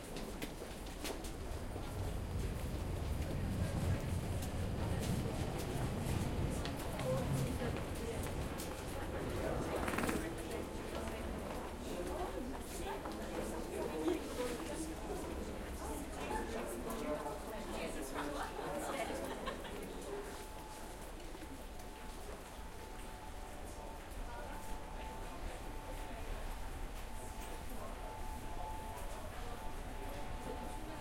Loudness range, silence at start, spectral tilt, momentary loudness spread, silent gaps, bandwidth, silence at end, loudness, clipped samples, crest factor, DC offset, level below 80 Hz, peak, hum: 9 LU; 0 s; -5.5 dB/octave; 11 LU; none; 16.5 kHz; 0 s; -43 LUFS; under 0.1%; 20 dB; under 0.1%; -48 dBFS; -22 dBFS; none